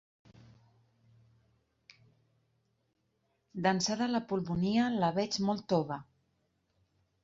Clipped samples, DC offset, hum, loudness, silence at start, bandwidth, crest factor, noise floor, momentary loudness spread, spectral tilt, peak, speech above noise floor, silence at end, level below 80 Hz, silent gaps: under 0.1%; under 0.1%; none; -32 LUFS; 3.55 s; 7.8 kHz; 20 dB; -78 dBFS; 7 LU; -5 dB/octave; -16 dBFS; 47 dB; 1.2 s; -68 dBFS; none